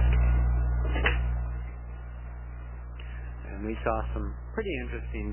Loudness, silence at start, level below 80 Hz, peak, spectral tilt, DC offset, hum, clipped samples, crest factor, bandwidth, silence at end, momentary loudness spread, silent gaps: -32 LUFS; 0 s; -30 dBFS; -8 dBFS; -10.5 dB/octave; 0.2%; 60 Hz at -35 dBFS; under 0.1%; 20 dB; 3.2 kHz; 0 s; 15 LU; none